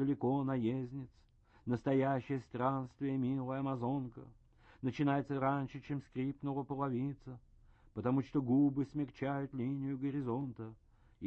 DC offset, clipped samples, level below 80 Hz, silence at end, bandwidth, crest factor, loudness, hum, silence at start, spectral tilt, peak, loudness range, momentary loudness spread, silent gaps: under 0.1%; under 0.1%; -66 dBFS; 0 s; 6.2 kHz; 16 dB; -37 LUFS; none; 0 s; -9.5 dB/octave; -20 dBFS; 2 LU; 15 LU; none